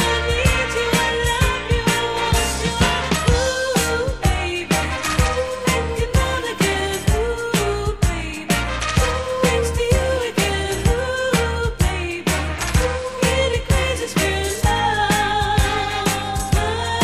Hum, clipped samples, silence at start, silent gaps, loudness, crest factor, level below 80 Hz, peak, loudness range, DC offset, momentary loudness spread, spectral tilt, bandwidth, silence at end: none; under 0.1%; 0 s; none; -19 LUFS; 18 dB; -26 dBFS; -2 dBFS; 2 LU; 0.4%; 3 LU; -4 dB/octave; 15.5 kHz; 0 s